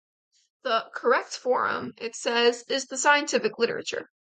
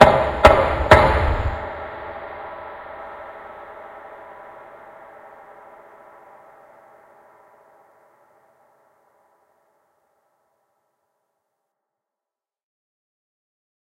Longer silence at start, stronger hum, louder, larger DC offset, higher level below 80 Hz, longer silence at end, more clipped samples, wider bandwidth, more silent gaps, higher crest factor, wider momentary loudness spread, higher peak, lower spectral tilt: first, 0.65 s vs 0 s; neither; second, -25 LUFS vs -17 LUFS; neither; second, -76 dBFS vs -34 dBFS; second, 0.3 s vs 9.95 s; neither; second, 9.4 kHz vs 16 kHz; neither; second, 18 dB vs 24 dB; second, 11 LU vs 29 LU; second, -8 dBFS vs 0 dBFS; second, -1.5 dB/octave vs -6 dB/octave